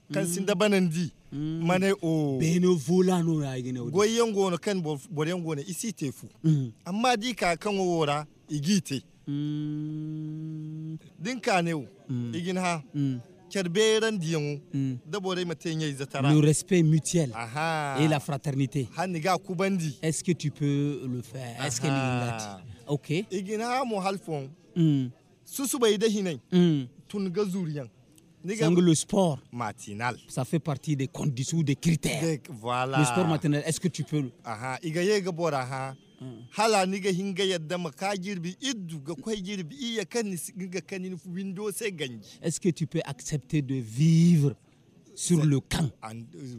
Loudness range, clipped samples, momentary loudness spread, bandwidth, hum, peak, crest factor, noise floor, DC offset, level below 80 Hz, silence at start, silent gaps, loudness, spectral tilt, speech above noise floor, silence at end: 6 LU; under 0.1%; 12 LU; 15.5 kHz; none; -10 dBFS; 18 dB; -57 dBFS; under 0.1%; -60 dBFS; 0.1 s; none; -28 LUFS; -5.5 dB/octave; 30 dB; 0 s